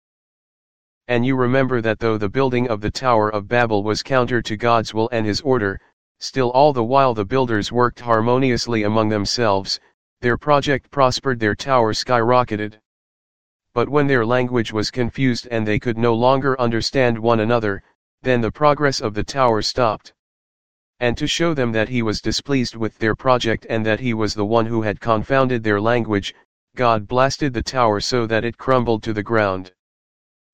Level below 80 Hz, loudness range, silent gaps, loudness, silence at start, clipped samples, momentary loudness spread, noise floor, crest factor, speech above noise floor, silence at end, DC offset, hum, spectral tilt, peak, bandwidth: -44 dBFS; 2 LU; 5.93-6.15 s, 9.94-10.17 s, 12.85-13.60 s, 17.95-18.18 s, 20.19-20.94 s, 26.45-26.67 s; -19 LUFS; 1 s; under 0.1%; 6 LU; under -90 dBFS; 18 dB; over 72 dB; 0.7 s; 2%; none; -5.5 dB/octave; 0 dBFS; 9.6 kHz